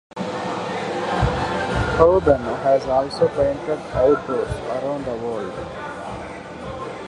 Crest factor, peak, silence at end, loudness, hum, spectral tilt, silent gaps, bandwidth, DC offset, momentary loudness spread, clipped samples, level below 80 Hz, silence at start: 20 dB; -2 dBFS; 0 s; -21 LUFS; none; -6.5 dB/octave; none; 11.5 kHz; under 0.1%; 14 LU; under 0.1%; -38 dBFS; 0.15 s